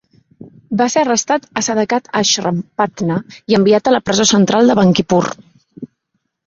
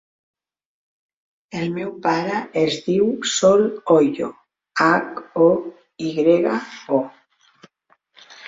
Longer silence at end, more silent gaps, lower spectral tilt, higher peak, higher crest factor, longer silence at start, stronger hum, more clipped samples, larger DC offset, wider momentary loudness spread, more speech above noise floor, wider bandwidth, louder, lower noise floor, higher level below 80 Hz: first, 0.6 s vs 0 s; neither; about the same, -4 dB/octave vs -4.5 dB/octave; about the same, 0 dBFS vs -2 dBFS; about the same, 14 dB vs 18 dB; second, 0.4 s vs 1.55 s; neither; neither; neither; about the same, 11 LU vs 12 LU; first, 57 dB vs 44 dB; about the same, 7.8 kHz vs 7.8 kHz; first, -14 LUFS vs -20 LUFS; first, -70 dBFS vs -62 dBFS; first, -52 dBFS vs -64 dBFS